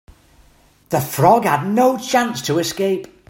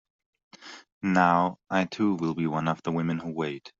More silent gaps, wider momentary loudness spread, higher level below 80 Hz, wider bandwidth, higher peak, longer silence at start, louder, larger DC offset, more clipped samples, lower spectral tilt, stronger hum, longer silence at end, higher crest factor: second, none vs 0.92-1.01 s; second, 8 LU vs 12 LU; first, -54 dBFS vs -66 dBFS; first, 16.5 kHz vs 7.6 kHz; first, 0 dBFS vs -6 dBFS; first, 0.9 s vs 0.6 s; first, -17 LUFS vs -27 LUFS; neither; neither; about the same, -5 dB/octave vs -5.5 dB/octave; neither; first, 0.25 s vs 0.1 s; about the same, 18 dB vs 22 dB